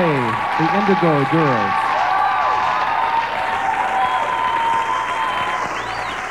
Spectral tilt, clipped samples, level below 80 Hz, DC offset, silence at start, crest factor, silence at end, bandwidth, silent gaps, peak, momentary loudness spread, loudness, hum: -5.5 dB/octave; under 0.1%; -50 dBFS; 0.3%; 0 s; 14 dB; 0 s; 15.5 kHz; none; -4 dBFS; 5 LU; -18 LUFS; none